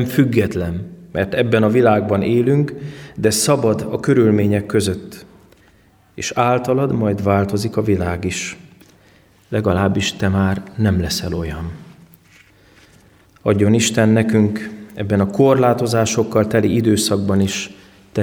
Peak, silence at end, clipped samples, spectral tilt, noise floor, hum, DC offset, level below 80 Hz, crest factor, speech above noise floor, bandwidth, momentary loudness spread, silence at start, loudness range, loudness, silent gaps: -2 dBFS; 0 s; under 0.1%; -5.5 dB/octave; -52 dBFS; none; under 0.1%; -44 dBFS; 16 dB; 36 dB; 19 kHz; 13 LU; 0 s; 4 LU; -17 LUFS; none